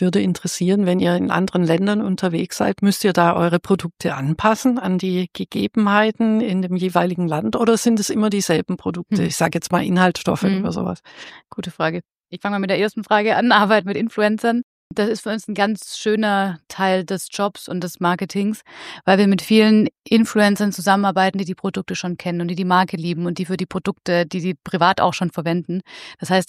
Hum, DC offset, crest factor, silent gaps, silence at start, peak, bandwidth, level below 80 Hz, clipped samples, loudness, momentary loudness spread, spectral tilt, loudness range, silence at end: none; under 0.1%; 18 dB; 12.05-12.09 s, 14.63-14.90 s; 0 s; -2 dBFS; 15.5 kHz; -58 dBFS; under 0.1%; -19 LUFS; 9 LU; -5.5 dB/octave; 4 LU; 0.05 s